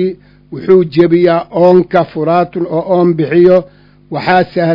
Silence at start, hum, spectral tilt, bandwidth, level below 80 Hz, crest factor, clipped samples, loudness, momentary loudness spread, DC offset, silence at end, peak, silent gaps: 0 s; 50 Hz at -45 dBFS; -9.5 dB/octave; 6 kHz; -48 dBFS; 10 dB; 1%; -11 LUFS; 10 LU; under 0.1%; 0 s; 0 dBFS; none